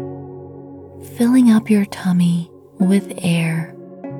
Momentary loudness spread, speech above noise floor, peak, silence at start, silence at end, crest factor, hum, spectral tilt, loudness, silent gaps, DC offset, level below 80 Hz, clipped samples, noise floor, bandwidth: 23 LU; 21 dB; -4 dBFS; 0 s; 0 s; 14 dB; none; -7 dB/octave; -17 LUFS; none; under 0.1%; -62 dBFS; under 0.1%; -36 dBFS; 15 kHz